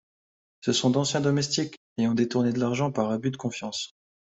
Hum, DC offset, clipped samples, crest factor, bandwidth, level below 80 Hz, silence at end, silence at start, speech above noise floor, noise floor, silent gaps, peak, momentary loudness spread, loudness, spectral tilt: none; under 0.1%; under 0.1%; 16 dB; 8.2 kHz; -64 dBFS; 0.35 s; 0.65 s; over 64 dB; under -90 dBFS; 1.77-1.96 s; -10 dBFS; 9 LU; -26 LUFS; -5 dB/octave